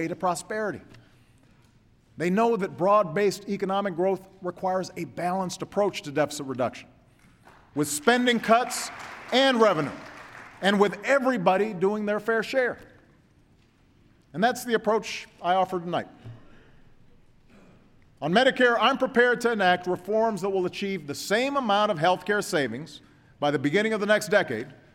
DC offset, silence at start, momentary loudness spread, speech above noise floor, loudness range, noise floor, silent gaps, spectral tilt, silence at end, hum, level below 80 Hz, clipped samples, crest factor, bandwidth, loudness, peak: under 0.1%; 0 s; 12 LU; 35 dB; 6 LU; -60 dBFS; none; -4.5 dB/octave; 0.2 s; none; -64 dBFS; under 0.1%; 20 dB; 16.5 kHz; -25 LUFS; -6 dBFS